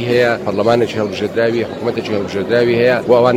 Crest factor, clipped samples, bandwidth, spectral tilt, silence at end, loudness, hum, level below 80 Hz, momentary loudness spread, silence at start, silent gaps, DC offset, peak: 14 dB; under 0.1%; 15.5 kHz; -6.5 dB/octave; 0 s; -15 LUFS; none; -50 dBFS; 8 LU; 0 s; none; under 0.1%; 0 dBFS